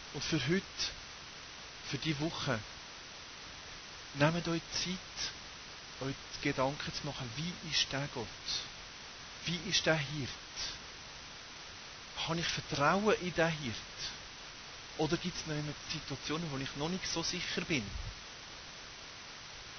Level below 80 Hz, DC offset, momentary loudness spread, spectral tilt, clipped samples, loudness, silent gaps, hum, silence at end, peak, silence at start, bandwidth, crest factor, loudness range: -58 dBFS; under 0.1%; 15 LU; -3.5 dB/octave; under 0.1%; -37 LUFS; none; none; 0 s; -14 dBFS; 0 s; 6.6 kHz; 22 dB; 4 LU